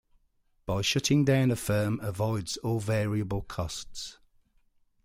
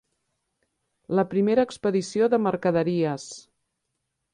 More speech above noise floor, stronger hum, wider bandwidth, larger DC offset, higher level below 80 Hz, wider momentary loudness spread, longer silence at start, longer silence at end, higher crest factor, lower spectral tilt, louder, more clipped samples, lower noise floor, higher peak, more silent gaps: second, 41 dB vs 56 dB; neither; first, 16 kHz vs 10.5 kHz; neither; first, -52 dBFS vs -64 dBFS; first, 14 LU vs 10 LU; second, 0.65 s vs 1.1 s; about the same, 0.9 s vs 0.95 s; about the same, 16 dB vs 18 dB; second, -5 dB/octave vs -6.5 dB/octave; second, -29 LUFS vs -24 LUFS; neither; second, -69 dBFS vs -79 dBFS; second, -14 dBFS vs -8 dBFS; neither